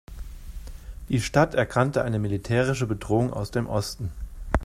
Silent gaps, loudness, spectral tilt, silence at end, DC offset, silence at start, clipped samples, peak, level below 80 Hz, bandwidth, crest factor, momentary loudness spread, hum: none; -25 LUFS; -6 dB/octave; 0 s; under 0.1%; 0.1 s; under 0.1%; -6 dBFS; -38 dBFS; 14.5 kHz; 20 dB; 20 LU; none